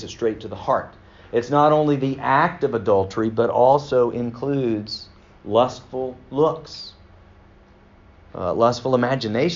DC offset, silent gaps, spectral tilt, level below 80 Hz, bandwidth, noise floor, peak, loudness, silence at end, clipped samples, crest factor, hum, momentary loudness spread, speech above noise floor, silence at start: under 0.1%; none; -5 dB/octave; -52 dBFS; 7.4 kHz; -50 dBFS; -2 dBFS; -21 LUFS; 0 s; under 0.1%; 18 dB; none; 15 LU; 30 dB; 0 s